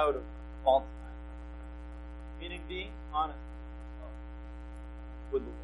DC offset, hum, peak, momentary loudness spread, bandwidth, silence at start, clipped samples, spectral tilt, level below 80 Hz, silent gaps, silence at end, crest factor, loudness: under 0.1%; 60 Hz at -45 dBFS; -12 dBFS; 17 LU; 11 kHz; 0 s; under 0.1%; -7 dB/octave; -44 dBFS; none; 0 s; 24 dB; -38 LUFS